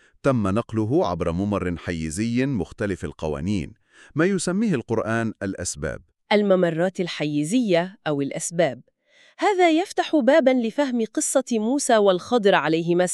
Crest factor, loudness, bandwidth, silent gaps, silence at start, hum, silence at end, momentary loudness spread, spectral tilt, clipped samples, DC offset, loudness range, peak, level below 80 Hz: 20 dB; -22 LUFS; 13 kHz; none; 0.25 s; none; 0 s; 10 LU; -5 dB/octave; under 0.1%; under 0.1%; 5 LU; -2 dBFS; -50 dBFS